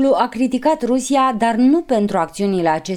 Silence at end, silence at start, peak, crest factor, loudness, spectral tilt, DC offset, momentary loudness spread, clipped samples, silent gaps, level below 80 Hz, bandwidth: 0 s; 0 s; -4 dBFS; 12 dB; -17 LUFS; -5.5 dB/octave; under 0.1%; 4 LU; under 0.1%; none; -50 dBFS; 13 kHz